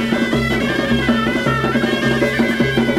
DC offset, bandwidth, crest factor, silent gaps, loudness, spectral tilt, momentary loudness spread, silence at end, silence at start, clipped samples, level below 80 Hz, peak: under 0.1%; 15.5 kHz; 12 dB; none; -16 LUFS; -5.5 dB/octave; 1 LU; 0 s; 0 s; under 0.1%; -36 dBFS; -4 dBFS